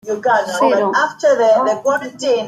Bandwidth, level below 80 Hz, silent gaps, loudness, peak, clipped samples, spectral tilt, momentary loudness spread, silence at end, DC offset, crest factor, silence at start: 14 kHz; -68 dBFS; none; -15 LUFS; -2 dBFS; under 0.1%; -3.5 dB/octave; 6 LU; 0 s; under 0.1%; 12 dB; 0.05 s